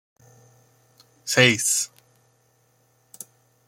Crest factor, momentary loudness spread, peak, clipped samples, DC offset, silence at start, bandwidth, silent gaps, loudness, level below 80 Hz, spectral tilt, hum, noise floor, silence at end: 26 dB; 25 LU; -2 dBFS; under 0.1%; under 0.1%; 1.25 s; 16.5 kHz; none; -19 LUFS; -68 dBFS; -2.5 dB/octave; none; -64 dBFS; 1.8 s